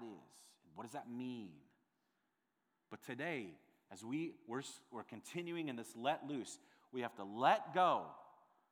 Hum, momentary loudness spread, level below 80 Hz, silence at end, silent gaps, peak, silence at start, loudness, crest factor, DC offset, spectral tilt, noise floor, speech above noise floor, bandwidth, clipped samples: none; 21 LU; under -90 dBFS; 0.4 s; none; -18 dBFS; 0 s; -42 LUFS; 24 dB; under 0.1%; -4.5 dB/octave; -85 dBFS; 44 dB; over 20 kHz; under 0.1%